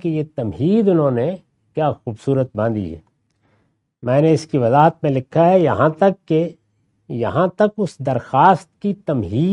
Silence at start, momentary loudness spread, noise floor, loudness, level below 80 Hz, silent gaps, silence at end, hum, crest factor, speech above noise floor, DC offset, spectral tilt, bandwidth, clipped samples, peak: 0.05 s; 12 LU; -64 dBFS; -18 LUFS; -56 dBFS; none; 0 s; none; 18 dB; 47 dB; under 0.1%; -8.5 dB/octave; 10.5 kHz; under 0.1%; 0 dBFS